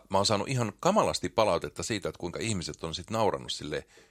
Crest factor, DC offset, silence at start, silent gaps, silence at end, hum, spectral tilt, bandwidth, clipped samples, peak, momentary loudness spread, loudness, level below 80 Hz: 22 dB; under 0.1%; 0.1 s; none; 0.25 s; none; -4.5 dB/octave; 15.5 kHz; under 0.1%; -8 dBFS; 9 LU; -30 LUFS; -56 dBFS